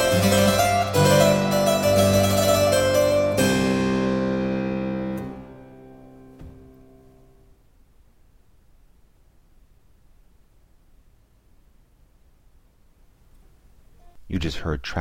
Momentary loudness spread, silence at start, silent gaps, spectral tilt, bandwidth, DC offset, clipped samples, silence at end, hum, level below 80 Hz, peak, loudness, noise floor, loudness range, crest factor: 11 LU; 0 s; none; -5 dB/octave; 17 kHz; under 0.1%; under 0.1%; 0 s; none; -44 dBFS; -4 dBFS; -20 LUFS; -56 dBFS; 19 LU; 18 dB